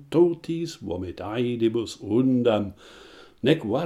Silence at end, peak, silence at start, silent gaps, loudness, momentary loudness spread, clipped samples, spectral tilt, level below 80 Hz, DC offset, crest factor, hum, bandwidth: 0 s; -6 dBFS; 0 s; none; -25 LUFS; 11 LU; under 0.1%; -7 dB/octave; -58 dBFS; under 0.1%; 20 dB; none; 11.5 kHz